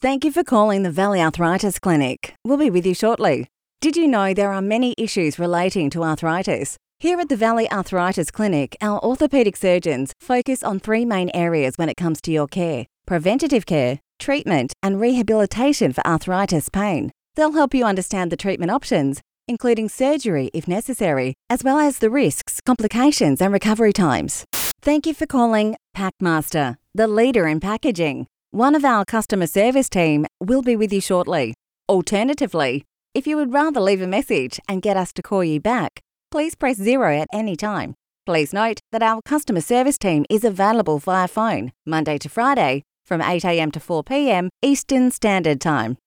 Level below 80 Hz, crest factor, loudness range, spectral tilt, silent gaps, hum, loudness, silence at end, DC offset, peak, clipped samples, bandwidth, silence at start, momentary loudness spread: -48 dBFS; 14 dB; 3 LU; -5.5 dB/octave; none; none; -20 LUFS; 0.1 s; under 0.1%; -4 dBFS; under 0.1%; over 20 kHz; 0 s; 7 LU